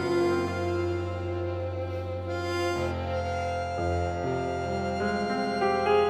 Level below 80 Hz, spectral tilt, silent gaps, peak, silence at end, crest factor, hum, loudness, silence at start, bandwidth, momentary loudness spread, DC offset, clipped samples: -48 dBFS; -6.5 dB/octave; none; -12 dBFS; 0 s; 16 dB; none; -29 LUFS; 0 s; 13.5 kHz; 6 LU; under 0.1%; under 0.1%